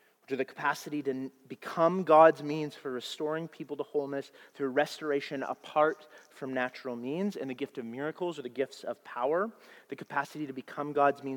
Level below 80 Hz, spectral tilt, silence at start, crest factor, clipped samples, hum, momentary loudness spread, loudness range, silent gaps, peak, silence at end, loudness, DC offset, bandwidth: -86 dBFS; -5.5 dB/octave; 0.3 s; 24 dB; under 0.1%; none; 12 LU; 7 LU; none; -8 dBFS; 0 s; -31 LUFS; under 0.1%; 18 kHz